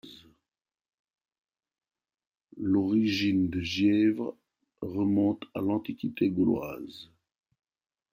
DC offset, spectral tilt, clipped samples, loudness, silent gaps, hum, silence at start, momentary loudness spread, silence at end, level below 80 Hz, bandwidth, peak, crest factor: under 0.1%; -7 dB/octave; under 0.1%; -28 LUFS; 0.89-1.05 s; none; 0.05 s; 14 LU; 1.1 s; -66 dBFS; 16 kHz; -14 dBFS; 16 dB